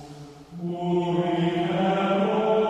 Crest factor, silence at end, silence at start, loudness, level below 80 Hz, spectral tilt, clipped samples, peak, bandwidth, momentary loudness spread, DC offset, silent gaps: 14 dB; 0 s; 0 s; -24 LUFS; -60 dBFS; -7.5 dB/octave; under 0.1%; -12 dBFS; 9.4 kHz; 18 LU; under 0.1%; none